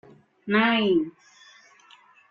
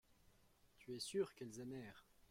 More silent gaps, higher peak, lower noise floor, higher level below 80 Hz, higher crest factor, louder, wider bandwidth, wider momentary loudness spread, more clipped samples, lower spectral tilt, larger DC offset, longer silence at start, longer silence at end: neither; first, -8 dBFS vs -30 dBFS; second, -55 dBFS vs -73 dBFS; first, -68 dBFS vs -80 dBFS; about the same, 18 dB vs 20 dB; first, -23 LUFS vs -48 LUFS; second, 7.2 kHz vs 16.5 kHz; about the same, 16 LU vs 18 LU; neither; first, -6.5 dB/octave vs -4.5 dB/octave; neither; first, 0.45 s vs 0.1 s; first, 1.2 s vs 0.1 s